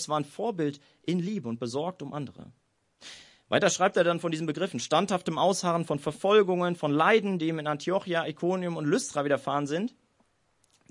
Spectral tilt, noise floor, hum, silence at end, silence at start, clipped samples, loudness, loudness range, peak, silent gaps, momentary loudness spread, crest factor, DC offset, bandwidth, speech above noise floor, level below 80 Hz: -5 dB/octave; -70 dBFS; none; 1 s; 0 s; under 0.1%; -28 LUFS; 6 LU; -8 dBFS; none; 11 LU; 20 dB; under 0.1%; 11.5 kHz; 42 dB; -74 dBFS